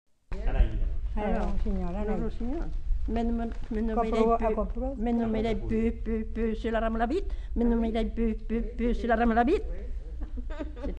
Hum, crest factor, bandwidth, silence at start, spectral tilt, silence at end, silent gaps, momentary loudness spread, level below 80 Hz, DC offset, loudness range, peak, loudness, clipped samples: none; 18 dB; 8 kHz; 0.3 s; -8.5 dB/octave; 0 s; none; 12 LU; -32 dBFS; under 0.1%; 4 LU; -10 dBFS; -30 LUFS; under 0.1%